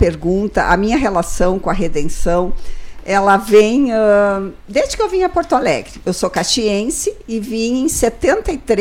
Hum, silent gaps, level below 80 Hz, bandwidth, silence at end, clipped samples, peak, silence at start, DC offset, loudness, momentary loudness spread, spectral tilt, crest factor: none; none; -28 dBFS; 16 kHz; 0 s; under 0.1%; -2 dBFS; 0 s; under 0.1%; -16 LUFS; 9 LU; -4.5 dB/octave; 14 dB